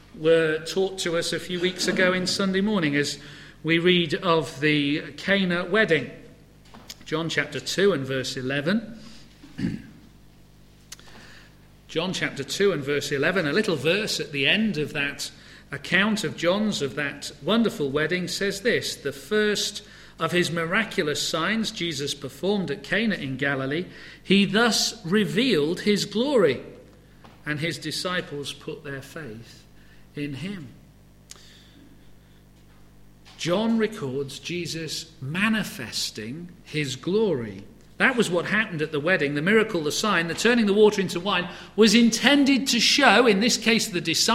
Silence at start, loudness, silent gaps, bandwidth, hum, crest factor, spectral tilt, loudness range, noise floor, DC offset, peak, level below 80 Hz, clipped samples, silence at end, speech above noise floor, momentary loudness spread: 0.15 s; -23 LUFS; none; 16 kHz; 50 Hz at -50 dBFS; 24 dB; -4 dB/octave; 12 LU; -52 dBFS; under 0.1%; 0 dBFS; -56 dBFS; under 0.1%; 0 s; 28 dB; 15 LU